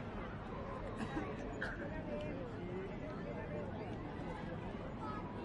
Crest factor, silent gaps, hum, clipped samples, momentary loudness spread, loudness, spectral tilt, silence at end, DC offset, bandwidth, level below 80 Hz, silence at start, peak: 16 dB; none; none; under 0.1%; 3 LU; -45 LUFS; -7.5 dB/octave; 0 s; under 0.1%; 11 kHz; -54 dBFS; 0 s; -28 dBFS